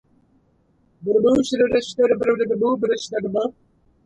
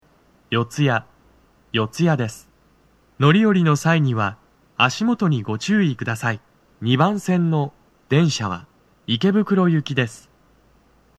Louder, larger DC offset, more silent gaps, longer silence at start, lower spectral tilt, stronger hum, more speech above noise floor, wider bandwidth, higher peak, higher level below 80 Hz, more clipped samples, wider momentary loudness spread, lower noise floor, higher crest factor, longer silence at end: about the same, -20 LUFS vs -20 LUFS; neither; neither; first, 1 s vs 0.5 s; about the same, -5 dB/octave vs -6 dB/octave; neither; first, 42 dB vs 38 dB; second, 10 kHz vs 13 kHz; second, -6 dBFS vs 0 dBFS; first, -56 dBFS vs -62 dBFS; neither; second, 7 LU vs 10 LU; first, -61 dBFS vs -57 dBFS; about the same, 16 dB vs 20 dB; second, 0.55 s vs 1 s